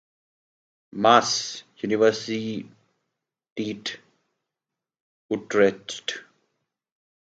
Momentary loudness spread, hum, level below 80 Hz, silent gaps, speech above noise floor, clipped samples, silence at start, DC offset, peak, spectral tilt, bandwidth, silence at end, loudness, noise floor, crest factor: 18 LU; none; -72 dBFS; 3.52-3.56 s, 5.00-5.29 s; 65 dB; under 0.1%; 0.95 s; under 0.1%; -2 dBFS; -3.5 dB/octave; 9.2 kHz; 1.05 s; -24 LUFS; -88 dBFS; 26 dB